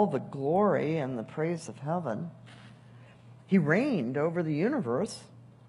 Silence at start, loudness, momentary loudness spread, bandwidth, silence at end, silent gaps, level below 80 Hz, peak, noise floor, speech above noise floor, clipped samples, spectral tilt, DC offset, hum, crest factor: 0 s; -30 LUFS; 11 LU; 11.5 kHz; 0.2 s; none; -74 dBFS; -12 dBFS; -53 dBFS; 24 dB; under 0.1%; -7.5 dB/octave; under 0.1%; none; 18 dB